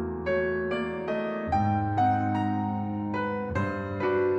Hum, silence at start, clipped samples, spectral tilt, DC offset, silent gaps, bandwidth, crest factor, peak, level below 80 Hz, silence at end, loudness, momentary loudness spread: none; 0 s; under 0.1%; -8.5 dB/octave; under 0.1%; none; 8 kHz; 12 dB; -14 dBFS; -54 dBFS; 0 s; -28 LUFS; 6 LU